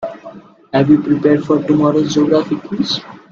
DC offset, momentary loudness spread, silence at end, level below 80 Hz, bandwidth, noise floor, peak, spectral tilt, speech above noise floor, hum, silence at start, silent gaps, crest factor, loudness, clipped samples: under 0.1%; 9 LU; 0.15 s; -52 dBFS; 7.2 kHz; -37 dBFS; 0 dBFS; -6.5 dB/octave; 23 dB; none; 0 s; none; 14 dB; -14 LUFS; under 0.1%